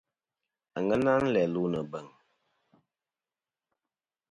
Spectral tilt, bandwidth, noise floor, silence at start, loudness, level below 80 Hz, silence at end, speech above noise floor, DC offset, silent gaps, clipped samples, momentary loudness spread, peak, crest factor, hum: -7.5 dB/octave; 11 kHz; under -90 dBFS; 0.75 s; -28 LUFS; -64 dBFS; 2.25 s; over 62 dB; under 0.1%; none; under 0.1%; 16 LU; -12 dBFS; 20 dB; none